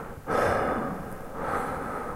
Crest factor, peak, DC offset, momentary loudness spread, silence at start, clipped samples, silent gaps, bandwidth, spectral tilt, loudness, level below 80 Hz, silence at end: 18 dB; -12 dBFS; under 0.1%; 10 LU; 0 s; under 0.1%; none; 16 kHz; -6 dB/octave; -29 LUFS; -46 dBFS; 0 s